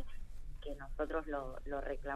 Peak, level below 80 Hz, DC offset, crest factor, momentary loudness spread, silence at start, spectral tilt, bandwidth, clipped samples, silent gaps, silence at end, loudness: -24 dBFS; -46 dBFS; under 0.1%; 16 dB; 13 LU; 0 s; -6.5 dB/octave; 9.4 kHz; under 0.1%; none; 0 s; -43 LUFS